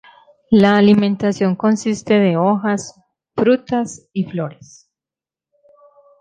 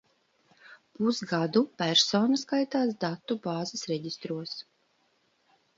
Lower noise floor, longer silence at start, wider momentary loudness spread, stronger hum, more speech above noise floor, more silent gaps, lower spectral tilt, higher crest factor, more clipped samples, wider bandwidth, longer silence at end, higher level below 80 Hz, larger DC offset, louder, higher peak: first, -89 dBFS vs -71 dBFS; second, 0.5 s vs 0.7 s; about the same, 13 LU vs 12 LU; neither; first, 74 dB vs 42 dB; neither; first, -6.5 dB/octave vs -4 dB/octave; about the same, 16 dB vs 20 dB; neither; first, 9.2 kHz vs 7.8 kHz; first, 1.65 s vs 1.15 s; first, -56 dBFS vs -76 dBFS; neither; first, -16 LUFS vs -28 LUFS; first, -2 dBFS vs -12 dBFS